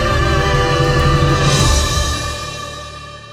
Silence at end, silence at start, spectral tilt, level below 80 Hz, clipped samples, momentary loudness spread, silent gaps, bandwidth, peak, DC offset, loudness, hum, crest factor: 0 s; 0 s; -4.5 dB/octave; -22 dBFS; under 0.1%; 15 LU; none; 15.5 kHz; -2 dBFS; under 0.1%; -15 LUFS; none; 14 dB